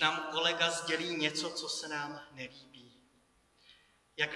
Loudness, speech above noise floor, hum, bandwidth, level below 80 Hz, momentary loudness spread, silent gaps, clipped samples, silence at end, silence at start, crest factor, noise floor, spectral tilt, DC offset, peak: -33 LUFS; 35 dB; none; 12 kHz; -78 dBFS; 17 LU; none; under 0.1%; 0 s; 0 s; 24 dB; -70 dBFS; -2 dB/octave; under 0.1%; -14 dBFS